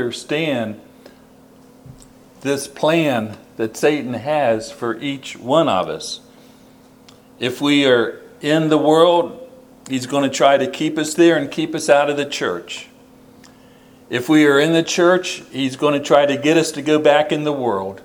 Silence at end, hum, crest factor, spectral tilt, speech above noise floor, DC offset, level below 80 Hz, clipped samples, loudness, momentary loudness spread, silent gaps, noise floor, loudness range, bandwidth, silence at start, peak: 0.05 s; none; 18 dB; -4.5 dB/octave; 30 dB; under 0.1%; -62 dBFS; under 0.1%; -17 LUFS; 13 LU; none; -47 dBFS; 6 LU; 19 kHz; 0 s; 0 dBFS